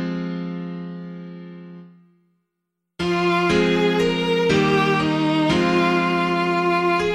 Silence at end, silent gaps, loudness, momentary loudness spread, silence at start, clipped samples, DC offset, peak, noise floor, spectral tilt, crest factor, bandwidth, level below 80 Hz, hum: 0 s; none; -19 LUFS; 17 LU; 0 s; under 0.1%; under 0.1%; -6 dBFS; -79 dBFS; -6 dB/octave; 14 dB; 12.5 kHz; -48 dBFS; none